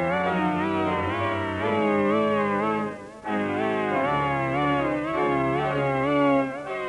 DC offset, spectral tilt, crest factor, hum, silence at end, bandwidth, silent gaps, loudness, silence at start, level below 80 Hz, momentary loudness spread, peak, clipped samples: under 0.1%; -7.5 dB/octave; 12 dB; none; 0 s; 11 kHz; none; -24 LUFS; 0 s; -54 dBFS; 5 LU; -12 dBFS; under 0.1%